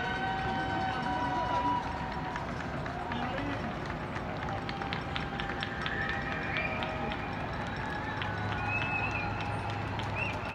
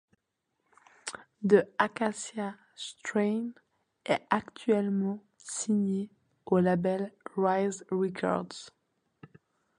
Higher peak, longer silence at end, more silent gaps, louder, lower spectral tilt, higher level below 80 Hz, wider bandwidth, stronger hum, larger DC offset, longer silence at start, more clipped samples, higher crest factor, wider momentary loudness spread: second, -14 dBFS vs -8 dBFS; second, 0 s vs 1.1 s; neither; second, -34 LUFS vs -30 LUFS; about the same, -6 dB/octave vs -5.5 dB/octave; first, -48 dBFS vs -72 dBFS; about the same, 12 kHz vs 11 kHz; neither; neither; second, 0 s vs 1.05 s; neither; about the same, 20 dB vs 22 dB; second, 5 LU vs 16 LU